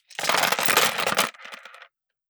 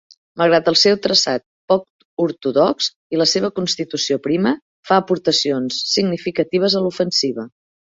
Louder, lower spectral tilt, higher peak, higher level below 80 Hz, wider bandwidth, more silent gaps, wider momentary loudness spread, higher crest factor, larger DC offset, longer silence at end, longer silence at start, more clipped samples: second, -21 LUFS vs -17 LUFS; second, -0.5 dB/octave vs -4 dB/octave; about the same, -4 dBFS vs -2 dBFS; second, -68 dBFS vs -60 dBFS; first, over 20 kHz vs 7.8 kHz; second, none vs 1.46-1.68 s, 1.90-1.99 s, 2.05-2.17 s, 2.96-3.10 s, 4.62-4.83 s; first, 22 LU vs 9 LU; about the same, 22 dB vs 18 dB; neither; first, 0.75 s vs 0.45 s; second, 0.1 s vs 0.35 s; neither